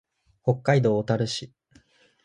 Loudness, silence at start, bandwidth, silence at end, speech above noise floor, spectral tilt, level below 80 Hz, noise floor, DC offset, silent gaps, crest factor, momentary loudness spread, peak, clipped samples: -25 LUFS; 0.45 s; 11 kHz; 0.8 s; 36 dB; -6.5 dB/octave; -62 dBFS; -59 dBFS; under 0.1%; none; 20 dB; 11 LU; -6 dBFS; under 0.1%